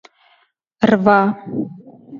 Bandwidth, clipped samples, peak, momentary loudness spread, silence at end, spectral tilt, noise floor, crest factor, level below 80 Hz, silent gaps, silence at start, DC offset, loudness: 7.2 kHz; under 0.1%; 0 dBFS; 14 LU; 0 s; -8 dB/octave; -60 dBFS; 18 dB; -58 dBFS; none; 0.8 s; under 0.1%; -16 LUFS